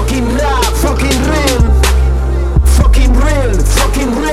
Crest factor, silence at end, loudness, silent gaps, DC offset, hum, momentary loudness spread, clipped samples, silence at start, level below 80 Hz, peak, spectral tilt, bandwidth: 10 dB; 0 s; -12 LUFS; none; 0.9%; none; 4 LU; under 0.1%; 0 s; -10 dBFS; 0 dBFS; -5 dB/octave; 14 kHz